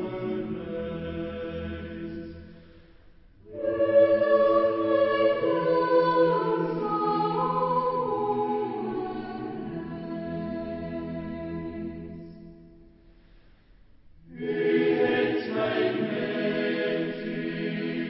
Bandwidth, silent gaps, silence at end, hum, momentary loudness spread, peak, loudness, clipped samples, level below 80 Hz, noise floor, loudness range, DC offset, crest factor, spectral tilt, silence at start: 5.8 kHz; none; 0 s; none; 15 LU; -10 dBFS; -27 LUFS; under 0.1%; -54 dBFS; -55 dBFS; 14 LU; under 0.1%; 18 dB; -10.5 dB/octave; 0 s